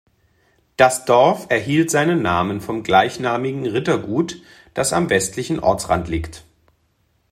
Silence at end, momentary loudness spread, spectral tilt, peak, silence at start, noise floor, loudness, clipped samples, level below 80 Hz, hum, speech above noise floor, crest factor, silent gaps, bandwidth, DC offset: 0.9 s; 11 LU; -4.5 dB/octave; 0 dBFS; 0.8 s; -64 dBFS; -18 LUFS; under 0.1%; -46 dBFS; none; 46 dB; 18 dB; none; 16 kHz; under 0.1%